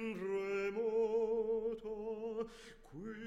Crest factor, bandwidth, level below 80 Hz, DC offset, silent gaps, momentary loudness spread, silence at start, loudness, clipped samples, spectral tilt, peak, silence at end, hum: 12 dB; 9.2 kHz; -64 dBFS; under 0.1%; none; 14 LU; 0 s; -38 LUFS; under 0.1%; -6.5 dB/octave; -26 dBFS; 0 s; none